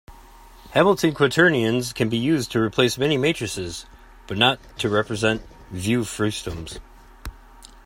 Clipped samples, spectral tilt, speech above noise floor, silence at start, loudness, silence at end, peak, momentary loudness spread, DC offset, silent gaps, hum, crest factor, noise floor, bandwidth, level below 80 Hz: under 0.1%; -4.5 dB/octave; 25 dB; 0.1 s; -21 LUFS; 0.2 s; -2 dBFS; 19 LU; under 0.1%; none; none; 20 dB; -46 dBFS; 16.5 kHz; -46 dBFS